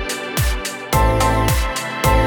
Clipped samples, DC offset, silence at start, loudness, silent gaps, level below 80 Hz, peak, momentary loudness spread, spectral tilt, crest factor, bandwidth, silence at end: under 0.1%; under 0.1%; 0 s; -18 LUFS; none; -22 dBFS; -2 dBFS; 6 LU; -4.5 dB/octave; 16 dB; 19.5 kHz; 0 s